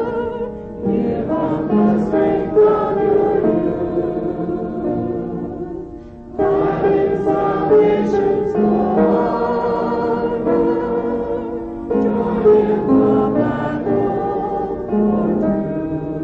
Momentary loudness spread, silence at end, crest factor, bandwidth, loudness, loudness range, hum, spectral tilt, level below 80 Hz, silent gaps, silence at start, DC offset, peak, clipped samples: 10 LU; 0 s; 14 dB; 5.8 kHz; -17 LUFS; 4 LU; none; -9.5 dB/octave; -42 dBFS; none; 0 s; under 0.1%; -4 dBFS; under 0.1%